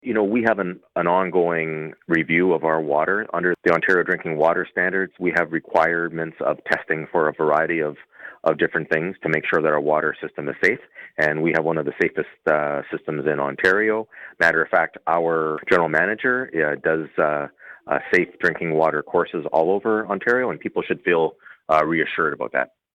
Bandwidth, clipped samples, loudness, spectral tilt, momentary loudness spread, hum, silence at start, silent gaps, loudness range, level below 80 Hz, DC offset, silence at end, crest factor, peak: 10.5 kHz; under 0.1%; -21 LUFS; -7 dB/octave; 7 LU; none; 0.05 s; none; 2 LU; -62 dBFS; under 0.1%; 0.3 s; 16 dB; -4 dBFS